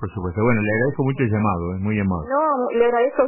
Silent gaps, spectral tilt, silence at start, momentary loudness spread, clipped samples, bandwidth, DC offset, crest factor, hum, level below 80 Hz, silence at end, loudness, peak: none; -12 dB/octave; 0 s; 4 LU; under 0.1%; 3.1 kHz; under 0.1%; 14 dB; none; -44 dBFS; 0 s; -20 LUFS; -6 dBFS